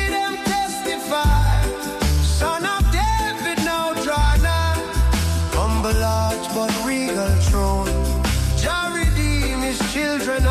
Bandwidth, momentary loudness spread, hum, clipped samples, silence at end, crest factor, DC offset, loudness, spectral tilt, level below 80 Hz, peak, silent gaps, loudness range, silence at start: 15.5 kHz; 4 LU; none; under 0.1%; 0 s; 12 dB; under 0.1%; -20 LUFS; -4.5 dB/octave; -22 dBFS; -8 dBFS; none; 0 LU; 0 s